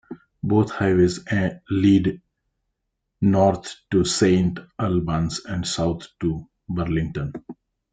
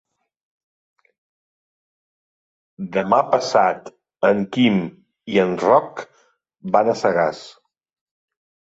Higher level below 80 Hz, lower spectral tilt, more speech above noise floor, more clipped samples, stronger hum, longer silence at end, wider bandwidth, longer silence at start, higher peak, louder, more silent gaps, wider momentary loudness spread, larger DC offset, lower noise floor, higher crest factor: first, -46 dBFS vs -64 dBFS; about the same, -6 dB/octave vs -6 dB/octave; second, 57 dB vs over 72 dB; neither; neither; second, 0.4 s vs 1.2 s; first, 9.4 kHz vs 8 kHz; second, 0.1 s vs 2.8 s; about the same, -4 dBFS vs -2 dBFS; second, -22 LUFS vs -19 LUFS; neither; second, 13 LU vs 17 LU; neither; second, -78 dBFS vs under -90 dBFS; about the same, 18 dB vs 20 dB